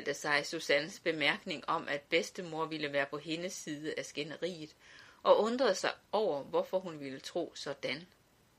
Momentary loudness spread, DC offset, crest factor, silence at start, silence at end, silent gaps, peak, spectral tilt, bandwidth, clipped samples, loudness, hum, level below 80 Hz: 10 LU; under 0.1%; 24 dB; 0 s; 0.55 s; none; -12 dBFS; -3.5 dB/octave; 15 kHz; under 0.1%; -34 LUFS; none; -78 dBFS